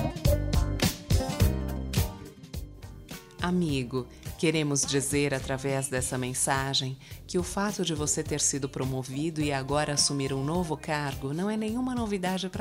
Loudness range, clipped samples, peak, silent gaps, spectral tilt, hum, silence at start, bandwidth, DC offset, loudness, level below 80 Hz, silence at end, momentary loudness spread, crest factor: 3 LU; under 0.1%; -12 dBFS; none; -4 dB/octave; none; 0 s; 16 kHz; under 0.1%; -29 LUFS; -38 dBFS; 0 s; 11 LU; 18 dB